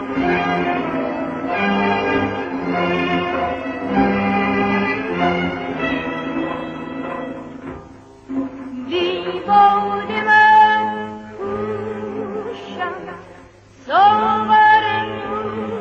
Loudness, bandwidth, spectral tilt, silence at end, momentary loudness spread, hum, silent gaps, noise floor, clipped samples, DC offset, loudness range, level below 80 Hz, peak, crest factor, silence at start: -18 LUFS; 7.2 kHz; -6.5 dB/octave; 0 s; 16 LU; none; none; -44 dBFS; under 0.1%; under 0.1%; 10 LU; -48 dBFS; -2 dBFS; 16 dB; 0 s